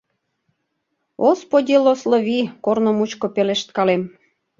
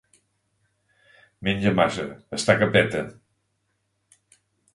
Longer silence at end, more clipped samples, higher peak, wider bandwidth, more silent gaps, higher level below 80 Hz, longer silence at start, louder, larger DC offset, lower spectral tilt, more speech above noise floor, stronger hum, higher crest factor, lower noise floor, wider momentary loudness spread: second, 0.5 s vs 1.6 s; neither; about the same, -2 dBFS vs -4 dBFS; second, 7.6 kHz vs 11.5 kHz; neither; second, -66 dBFS vs -54 dBFS; second, 1.2 s vs 1.4 s; first, -18 LUFS vs -23 LUFS; neither; about the same, -5.5 dB/octave vs -5 dB/octave; first, 56 dB vs 51 dB; neither; second, 16 dB vs 24 dB; about the same, -73 dBFS vs -73 dBFS; second, 6 LU vs 13 LU